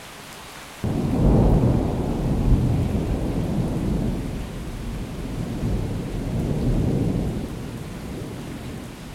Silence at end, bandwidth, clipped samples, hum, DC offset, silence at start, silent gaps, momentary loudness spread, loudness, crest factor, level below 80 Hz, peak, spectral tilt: 0 s; 16 kHz; under 0.1%; none; under 0.1%; 0 s; none; 14 LU; -25 LUFS; 18 dB; -30 dBFS; -6 dBFS; -8 dB/octave